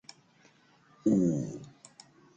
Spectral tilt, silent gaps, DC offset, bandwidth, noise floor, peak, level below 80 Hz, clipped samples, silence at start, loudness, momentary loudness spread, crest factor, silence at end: -8 dB/octave; none; under 0.1%; 9.2 kHz; -63 dBFS; -16 dBFS; -68 dBFS; under 0.1%; 1.05 s; -30 LUFS; 26 LU; 18 dB; 0.7 s